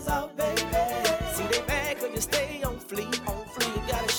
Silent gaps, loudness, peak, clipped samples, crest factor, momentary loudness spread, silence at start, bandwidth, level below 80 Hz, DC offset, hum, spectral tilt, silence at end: none; -28 LUFS; -10 dBFS; under 0.1%; 18 dB; 6 LU; 0 s; 19 kHz; -42 dBFS; under 0.1%; none; -3 dB/octave; 0 s